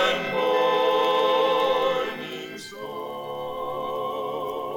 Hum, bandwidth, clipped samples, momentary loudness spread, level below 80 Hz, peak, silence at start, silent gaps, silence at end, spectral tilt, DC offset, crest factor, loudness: none; 17.5 kHz; under 0.1%; 13 LU; -62 dBFS; -10 dBFS; 0 s; none; 0 s; -3.5 dB/octave; under 0.1%; 16 dB; -24 LUFS